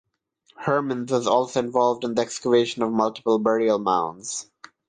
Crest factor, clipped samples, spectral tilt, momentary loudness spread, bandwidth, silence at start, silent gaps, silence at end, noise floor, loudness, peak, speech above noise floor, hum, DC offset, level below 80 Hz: 16 dB; under 0.1%; -4.5 dB/octave; 8 LU; 9.8 kHz; 0.6 s; none; 0.45 s; -63 dBFS; -23 LUFS; -6 dBFS; 41 dB; none; under 0.1%; -68 dBFS